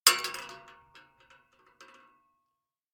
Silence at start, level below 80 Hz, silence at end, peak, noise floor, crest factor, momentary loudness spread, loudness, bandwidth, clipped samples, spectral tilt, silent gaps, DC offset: 0.05 s; -74 dBFS; 2.35 s; -2 dBFS; -84 dBFS; 34 dB; 28 LU; -29 LUFS; over 20 kHz; under 0.1%; 2 dB/octave; none; under 0.1%